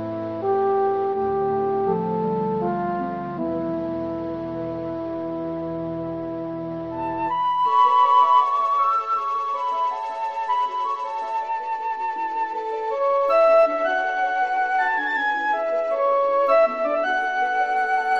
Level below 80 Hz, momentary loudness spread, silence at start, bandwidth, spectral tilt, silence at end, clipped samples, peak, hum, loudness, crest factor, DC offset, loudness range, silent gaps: -58 dBFS; 12 LU; 0 s; 7.8 kHz; -6.5 dB/octave; 0 s; under 0.1%; -6 dBFS; none; -22 LUFS; 16 dB; 0.2%; 8 LU; none